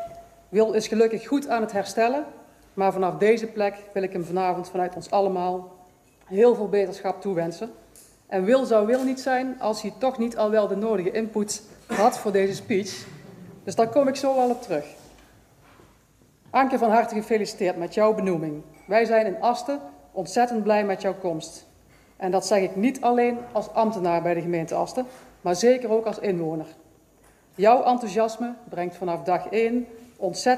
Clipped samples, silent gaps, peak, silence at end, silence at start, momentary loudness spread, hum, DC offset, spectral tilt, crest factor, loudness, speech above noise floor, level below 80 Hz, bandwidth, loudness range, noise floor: under 0.1%; none; -6 dBFS; 0 s; 0 s; 12 LU; none; under 0.1%; -5 dB/octave; 18 dB; -24 LUFS; 35 dB; -64 dBFS; 15 kHz; 2 LU; -58 dBFS